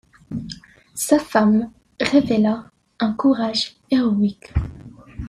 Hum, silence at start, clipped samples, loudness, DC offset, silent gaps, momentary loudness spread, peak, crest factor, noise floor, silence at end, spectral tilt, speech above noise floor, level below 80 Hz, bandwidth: none; 0.3 s; under 0.1%; -20 LUFS; under 0.1%; none; 17 LU; -2 dBFS; 18 dB; -40 dBFS; 0 s; -5 dB/octave; 22 dB; -40 dBFS; 14 kHz